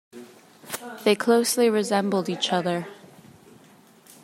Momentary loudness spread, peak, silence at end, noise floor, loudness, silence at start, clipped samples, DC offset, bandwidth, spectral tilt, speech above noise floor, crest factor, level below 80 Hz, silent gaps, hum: 15 LU; -6 dBFS; 1.3 s; -53 dBFS; -23 LUFS; 0.15 s; under 0.1%; under 0.1%; 16 kHz; -4 dB/octave; 31 dB; 18 dB; -76 dBFS; none; none